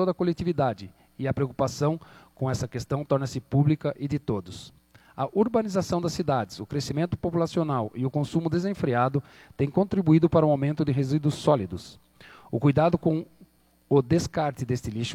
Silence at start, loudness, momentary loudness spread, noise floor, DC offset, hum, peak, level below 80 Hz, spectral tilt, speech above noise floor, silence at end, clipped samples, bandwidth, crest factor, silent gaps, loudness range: 0 s; -26 LUFS; 10 LU; -57 dBFS; under 0.1%; none; -6 dBFS; -52 dBFS; -7.5 dB/octave; 32 dB; 0 s; under 0.1%; 14 kHz; 18 dB; none; 4 LU